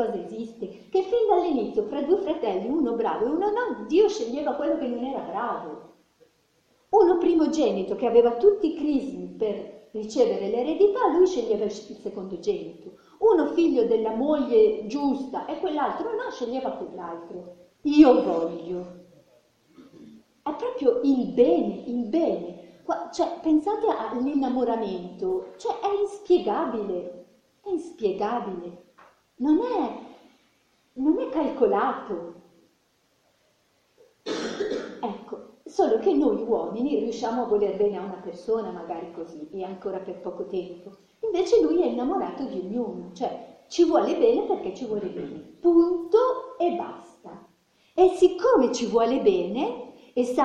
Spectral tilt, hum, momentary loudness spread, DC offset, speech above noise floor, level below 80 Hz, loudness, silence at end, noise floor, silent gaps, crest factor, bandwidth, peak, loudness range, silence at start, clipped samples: -6 dB/octave; none; 15 LU; under 0.1%; 43 dB; -60 dBFS; -25 LUFS; 0 s; -67 dBFS; none; 22 dB; 9.2 kHz; -4 dBFS; 6 LU; 0 s; under 0.1%